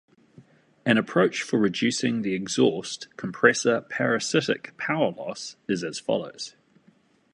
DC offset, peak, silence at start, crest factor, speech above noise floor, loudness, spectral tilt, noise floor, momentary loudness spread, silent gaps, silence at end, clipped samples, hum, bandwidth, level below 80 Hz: under 0.1%; -2 dBFS; 0.85 s; 24 dB; 36 dB; -25 LUFS; -4 dB/octave; -61 dBFS; 13 LU; none; 0.85 s; under 0.1%; none; 11 kHz; -68 dBFS